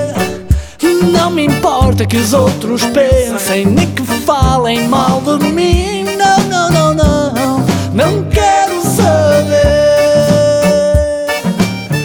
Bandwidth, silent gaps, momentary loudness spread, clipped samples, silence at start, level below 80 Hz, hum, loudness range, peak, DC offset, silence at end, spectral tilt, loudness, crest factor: over 20 kHz; none; 5 LU; under 0.1%; 0 s; -24 dBFS; none; 2 LU; 0 dBFS; under 0.1%; 0 s; -5.5 dB/octave; -11 LUFS; 10 dB